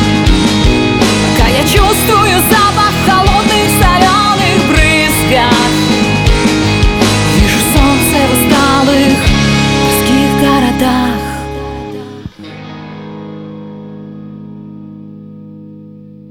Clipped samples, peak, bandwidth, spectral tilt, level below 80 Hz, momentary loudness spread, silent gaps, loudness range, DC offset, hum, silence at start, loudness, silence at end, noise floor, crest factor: under 0.1%; 0 dBFS; over 20 kHz; -4.5 dB/octave; -20 dBFS; 20 LU; none; 19 LU; under 0.1%; none; 0 s; -9 LUFS; 0 s; -33 dBFS; 10 dB